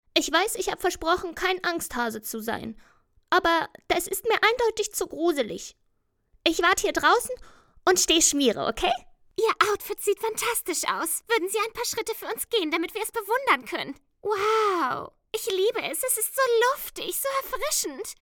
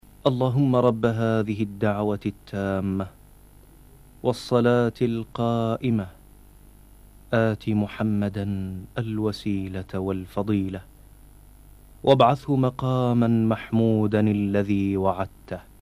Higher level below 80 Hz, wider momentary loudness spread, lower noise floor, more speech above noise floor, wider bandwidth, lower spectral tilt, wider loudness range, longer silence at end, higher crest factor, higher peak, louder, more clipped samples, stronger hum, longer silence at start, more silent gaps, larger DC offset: about the same, -54 dBFS vs -50 dBFS; about the same, 11 LU vs 10 LU; first, -71 dBFS vs -50 dBFS; first, 46 dB vs 27 dB; first, 19 kHz vs 14 kHz; second, -1 dB/octave vs -8 dB/octave; about the same, 4 LU vs 6 LU; about the same, 0.1 s vs 0.2 s; first, 24 dB vs 18 dB; about the same, -4 dBFS vs -6 dBFS; about the same, -25 LUFS vs -24 LUFS; neither; neither; about the same, 0.15 s vs 0.25 s; neither; neither